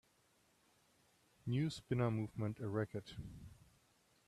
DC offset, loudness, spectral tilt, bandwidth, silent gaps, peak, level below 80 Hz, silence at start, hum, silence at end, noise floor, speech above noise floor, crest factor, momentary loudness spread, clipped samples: under 0.1%; -41 LUFS; -7.5 dB/octave; 13 kHz; none; -24 dBFS; -68 dBFS; 1.45 s; none; 0.75 s; -75 dBFS; 35 dB; 20 dB; 16 LU; under 0.1%